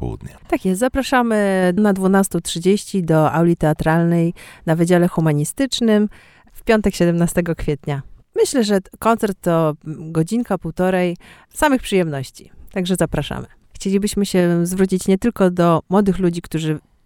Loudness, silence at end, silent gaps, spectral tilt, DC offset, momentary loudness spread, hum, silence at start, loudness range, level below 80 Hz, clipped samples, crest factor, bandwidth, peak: -18 LUFS; 0.25 s; none; -6 dB/octave; under 0.1%; 9 LU; none; 0 s; 4 LU; -40 dBFS; under 0.1%; 18 dB; 17 kHz; 0 dBFS